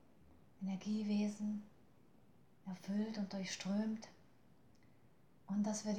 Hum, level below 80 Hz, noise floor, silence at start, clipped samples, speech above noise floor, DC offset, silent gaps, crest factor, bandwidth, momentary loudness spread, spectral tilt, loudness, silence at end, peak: none; -80 dBFS; -70 dBFS; 0.6 s; under 0.1%; 29 dB; under 0.1%; none; 14 dB; 9.2 kHz; 12 LU; -5.5 dB/octave; -42 LUFS; 0 s; -30 dBFS